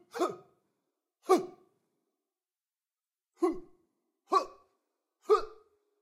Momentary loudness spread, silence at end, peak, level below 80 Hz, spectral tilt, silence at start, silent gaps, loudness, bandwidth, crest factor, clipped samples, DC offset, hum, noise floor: 19 LU; 0.5 s; -12 dBFS; -64 dBFS; -4 dB/octave; 0.15 s; none; -31 LUFS; 15.5 kHz; 24 dB; under 0.1%; under 0.1%; none; under -90 dBFS